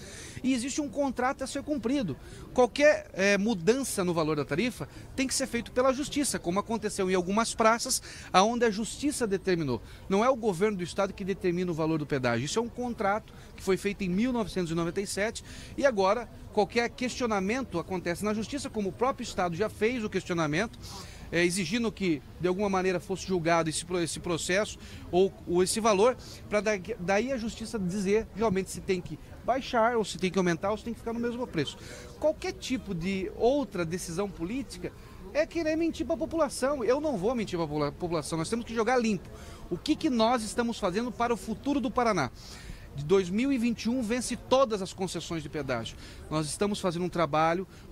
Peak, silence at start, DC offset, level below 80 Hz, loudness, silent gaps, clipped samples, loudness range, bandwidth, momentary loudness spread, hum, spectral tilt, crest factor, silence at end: -8 dBFS; 0 s; under 0.1%; -50 dBFS; -29 LUFS; none; under 0.1%; 4 LU; 16 kHz; 9 LU; none; -4.5 dB/octave; 20 dB; 0 s